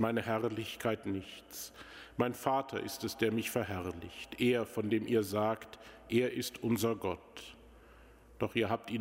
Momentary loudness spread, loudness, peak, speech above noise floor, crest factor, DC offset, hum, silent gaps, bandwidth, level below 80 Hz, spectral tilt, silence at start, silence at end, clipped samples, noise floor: 14 LU; -35 LUFS; -14 dBFS; 23 dB; 20 dB; under 0.1%; none; none; 16 kHz; -64 dBFS; -5 dB/octave; 0 s; 0 s; under 0.1%; -58 dBFS